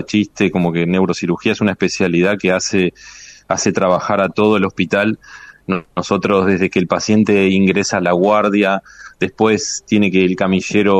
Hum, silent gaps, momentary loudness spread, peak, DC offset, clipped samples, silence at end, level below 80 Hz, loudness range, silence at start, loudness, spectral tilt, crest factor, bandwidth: none; none; 8 LU; -2 dBFS; under 0.1%; under 0.1%; 0 s; -52 dBFS; 2 LU; 0 s; -15 LUFS; -5 dB/octave; 14 dB; 8.6 kHz